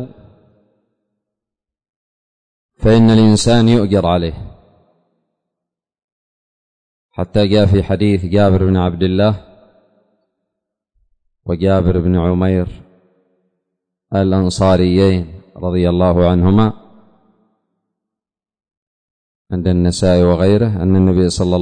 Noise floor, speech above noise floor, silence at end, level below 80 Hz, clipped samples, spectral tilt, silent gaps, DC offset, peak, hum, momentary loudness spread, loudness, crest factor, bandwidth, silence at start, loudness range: -86 dBFS; 74 dB; 0 s; -36 dBFS; under 0.1%; -7 dB/octave; 1.89-2.69 s, 6.04-7.09 s, 18.77-19.45 s; under 0.1%; -2 dBFS; none; 13 LU; -13 LUFS; 14 dB; 9.6 kHz; 0 s; 7 LU